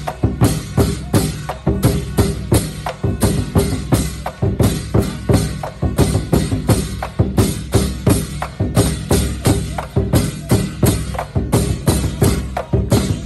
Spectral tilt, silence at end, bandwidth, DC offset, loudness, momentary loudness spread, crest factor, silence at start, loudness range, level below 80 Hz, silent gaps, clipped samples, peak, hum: -6 dB/octave; 0 s; 16 kHz; under 0.1%; -18 LUFS; 6 LU; 16 dB; 0 s; 1 LU; -26 dBFS; none; under 0.1%; -2 dBFS; none